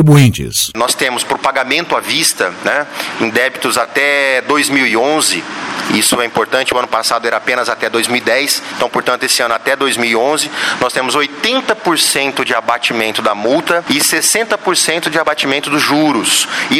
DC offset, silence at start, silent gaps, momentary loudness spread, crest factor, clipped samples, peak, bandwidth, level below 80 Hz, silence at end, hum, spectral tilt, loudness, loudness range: under 0.1%; 0 s; none; 4 LU; 12 dB; under 0.1%; 0 dBFS; 16.5 kHz; -48 dBFS; 0 s; none; -3 dB/octave; -12 LUFS; 1 LU